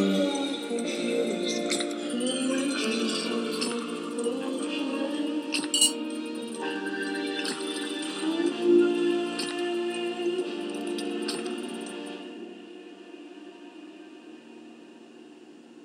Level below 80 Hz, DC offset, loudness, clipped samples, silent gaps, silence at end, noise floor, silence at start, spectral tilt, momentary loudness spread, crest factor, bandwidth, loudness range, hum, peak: under -90 dBFS; under 0.1%; -28 LUFS; under 0.1%; none; 0 s; -49 dBFS; 0 s; -3 dB/octave; 22 LU; 22 dB; 16 kHz; 13 LU; none; -8 dBFS